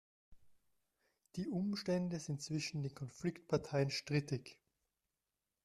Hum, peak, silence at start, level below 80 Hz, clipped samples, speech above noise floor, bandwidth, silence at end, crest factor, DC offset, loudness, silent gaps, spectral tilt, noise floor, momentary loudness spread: none; -22 dBFS; 0.3 s; -72 dBFS; under 0.1%; over 50 dB; 12.5 kHz; 1.1 s; 20 dB; under 0.1%; -40 LUFS; none; -5.5 dB/octave; under -90 dBFS; 8 LU